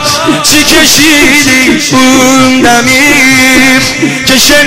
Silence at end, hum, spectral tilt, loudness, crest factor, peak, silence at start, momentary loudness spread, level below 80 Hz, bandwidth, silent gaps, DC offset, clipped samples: 0 s; none; -2 dB/octave; -3 LUFS; 4 dB; 0 dBFS; 0 s; 4 LU; -30 dBFS; over 20 kHz; none; 3%; 4%